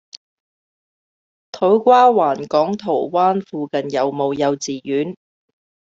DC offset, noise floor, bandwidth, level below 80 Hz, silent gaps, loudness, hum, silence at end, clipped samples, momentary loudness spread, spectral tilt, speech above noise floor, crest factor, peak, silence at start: under 0.1%; under -90 dBFS; 7.8 kHz; -66 dBFS; 0.17-1.53 s; -17 LUFS; none; 0.75 s; under 0.1%; 12 LU; -5.5 dB/octave; over 73 dB; 18 dB; -2 dBFS; 0.15 s